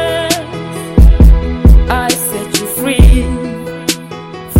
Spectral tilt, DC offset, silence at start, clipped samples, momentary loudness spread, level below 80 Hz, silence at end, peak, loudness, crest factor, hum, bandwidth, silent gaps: -5 dB/octave; under 0.1%; 0 s; 3%; 13 LU; -12 dBFS; 0 s; 0 dBFS; -12 LUFS; 10 dB; none; 16.5 kHz; none